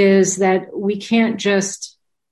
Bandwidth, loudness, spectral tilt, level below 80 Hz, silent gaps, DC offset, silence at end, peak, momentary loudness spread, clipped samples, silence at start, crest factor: 12 kHz; -17 LUFS; -4.5 dB/octave; -60 dBFS; none; under 0.1%; 0.45 s; -4 dBFS; 12 LU; under 0.1%; 0 s; 14 dB